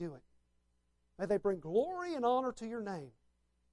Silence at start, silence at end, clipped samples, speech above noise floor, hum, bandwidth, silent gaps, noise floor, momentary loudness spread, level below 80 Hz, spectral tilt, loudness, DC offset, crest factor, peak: 0 s; 0.65 s; under 0.1%; 41 dB; 60 Hz at -70 dBFS; 11.5 kHz; none; -77 dBFS; 13 LU; -70 dBFS; -6.5 dB/octave; -36 LUFS; under 0.1%; 18 dB; -20 dBFS